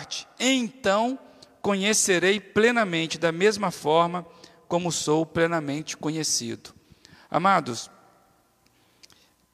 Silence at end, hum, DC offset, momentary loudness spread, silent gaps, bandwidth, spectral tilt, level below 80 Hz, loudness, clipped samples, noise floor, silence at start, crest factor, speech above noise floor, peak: 1.65 s; none; under 0.1%; 13 LU; none; 15 kHz; -3.5 dB/octave; -66 dBFS; -24 LUFS; under 0.1%; -63 dBFS; 0 s; 20 dB; 39 dB; -6 dBFS